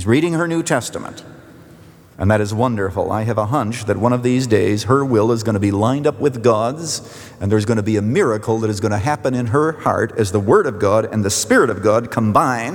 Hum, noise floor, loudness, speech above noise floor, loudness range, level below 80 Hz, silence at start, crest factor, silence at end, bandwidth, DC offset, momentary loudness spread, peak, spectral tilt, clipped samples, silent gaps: none; -43 dBFS; -17 LUFS; 26 dB; 4 LU; -54 dBFS; 0 s; 16 dB; 0 s; 19.5 kHz; under 0.1%; 6 LU; -2 dBFS; -6 dB/octave; under 0.1%; none